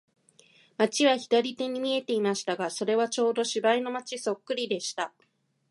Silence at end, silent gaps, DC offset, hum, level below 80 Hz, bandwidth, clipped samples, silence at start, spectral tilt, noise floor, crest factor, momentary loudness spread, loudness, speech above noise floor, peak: 0.65 s; none; under 0.1%; none; -82 dBFS; 11.5 kHz; under 0.1%; 0.8 s; -3 dB/octave; -60 dBFS; 20 dB; 9 LU; -28 LUFS; 33 dB; -8 dBFS